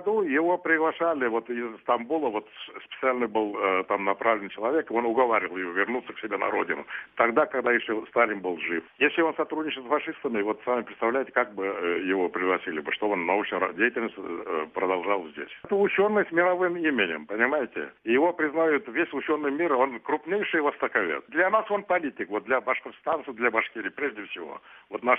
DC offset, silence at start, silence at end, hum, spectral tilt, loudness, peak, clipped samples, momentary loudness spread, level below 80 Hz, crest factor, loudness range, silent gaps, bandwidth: under 0.1%; 0 s; 0 s; none; -7.5 dB/octave; -26 LUFS; -6 dBFS; under 0.1%; 8 LU; -72 dBFS; 20 dB; 2 LU; none; 3.8 kHz